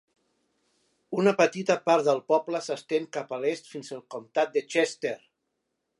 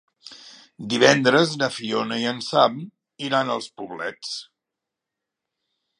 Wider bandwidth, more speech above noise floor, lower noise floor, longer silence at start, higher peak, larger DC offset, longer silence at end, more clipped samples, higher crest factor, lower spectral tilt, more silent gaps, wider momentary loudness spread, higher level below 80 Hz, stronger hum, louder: about the same, 11.5 kHz vs 11 kHz; second, 54 dB vs 63 dB; second, -80 dBFS vs -85 dBFS; first, 1.1 s vs 0.25 s; second, -8 dBFS vs 0 dBFS; neither; second, 0.8 s vs 1.55 s; neither; about the same, 20 dB vs 24 dB; about the same, -4.5 dB/octave vs -4 dB/octave; neither; second, 15 LU vs 21 LU; second, -80 dBFS vs -72 dBFS; neither; second, -27 LUFS vs -21 LUFS